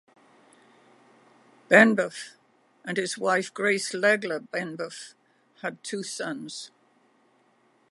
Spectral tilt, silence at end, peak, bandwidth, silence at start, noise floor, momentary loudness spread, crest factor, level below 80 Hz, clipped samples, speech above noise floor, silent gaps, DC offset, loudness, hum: -4 dB/octave; 1.25 s; -2 dBFS; 11.5 kHz; 1.7 s; -65 dBFS; 22 LU; 26 dB; -84 dBFS; under 0.1%; 39 dB; none; under 0.1%; -25 LUFS; none